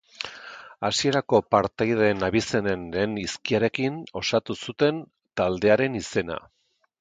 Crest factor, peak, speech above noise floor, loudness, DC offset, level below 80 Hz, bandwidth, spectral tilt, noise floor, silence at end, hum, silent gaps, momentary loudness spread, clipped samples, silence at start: 20 dB; -4 dBFS; 19 dB; -24 LUFS; under 0.1%; -54 dBFS; 9.4 kHz; -5 dB/octave; -43 dBFS; 0.6 s; none; none; 14 LU; under 0.1%; 0.2 s